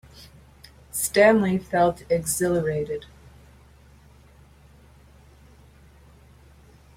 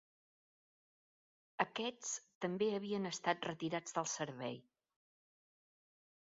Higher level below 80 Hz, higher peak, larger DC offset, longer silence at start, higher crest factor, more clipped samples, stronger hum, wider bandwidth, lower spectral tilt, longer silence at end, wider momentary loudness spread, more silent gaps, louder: first, -52 dBFS vs -86 dBFS; first, -4 dBFS vs -18 dBFS; neither; second, 0.2 s vs 1.6 s; about the same, 22 dB vs 26 dB; neither; neither; first, 16.5 kHz vs 7.6 kHz; about the same, -4.5 dB/octave vs -3.5 dB/octave; first, 3.95 s vs 1.6 s; first, 14 LU vs 7 LU; second, none vs 2.35-2.41 s; first, -22 LUFS vs -41 LUFS